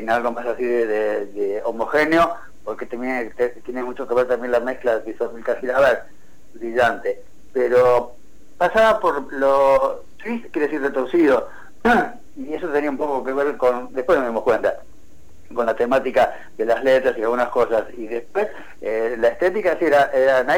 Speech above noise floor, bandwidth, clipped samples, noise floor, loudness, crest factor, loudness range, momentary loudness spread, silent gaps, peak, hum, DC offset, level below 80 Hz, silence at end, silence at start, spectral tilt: 31 dB; 17.5 kHz; under 0.1%; -50 dBFS; -20 LUFS; 12 dB; 3 LU; 12 LU; none; -8 dBFS; none; 2%; -48 dBFS; 0 s; 0 s; -5.5 dB/octave